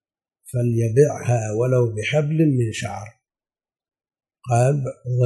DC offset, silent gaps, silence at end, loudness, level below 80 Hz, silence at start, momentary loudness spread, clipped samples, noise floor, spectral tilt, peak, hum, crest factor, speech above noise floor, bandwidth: under 0.1%; none; 0 s; -21 LUFS; -58 dBFS; 0.45 s; 11 LU; under 0.1%; under -90 dBFS; -7 dB/octave; -4 dBFS; none; 18 dB; over 71 dB; 12 kHz